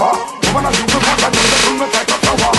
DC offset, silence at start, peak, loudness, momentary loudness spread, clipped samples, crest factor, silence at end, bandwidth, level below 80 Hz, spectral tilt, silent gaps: under 0.1%; 0 s; 0 dBFS; -12 LUFS; 5 LU; under 0.1%; 14 dB; 0 s; 12.5 kHz; -32 dBFS; -2.5 dB/octave; none